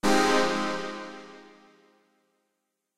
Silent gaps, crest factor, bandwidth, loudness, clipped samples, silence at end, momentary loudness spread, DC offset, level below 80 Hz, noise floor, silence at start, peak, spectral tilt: none; 20 dB; 16 kHz; -26 LUFS; under 0.1%; 0 s; 22 LU; under 0.1%; -58 dBFS; -80 dBFS; 0 s; -10 dBFS; -3.5 dB/octave